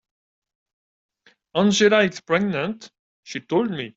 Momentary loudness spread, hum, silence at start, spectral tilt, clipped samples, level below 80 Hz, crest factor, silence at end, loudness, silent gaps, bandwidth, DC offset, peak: 18 LU; none; 1.55 s; -4.5 dB/octave; under 0.1%; -64 dBFS; 18 dB; 0.05 s; -21 LUFS; 2.99-3.23 s; 7.8 kHz; under 0.1%; -4 dBFS